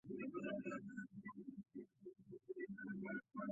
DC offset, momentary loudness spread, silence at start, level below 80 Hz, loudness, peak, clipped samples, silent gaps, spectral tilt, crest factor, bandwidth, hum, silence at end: under 0.1%; 12 LU; 0.05 s; -84 dBFS; -51 LUFS; -34 dBFS; under 0.1%; none; -6 dB/octave; 16 dB; 7.4 kHz; none; 0 s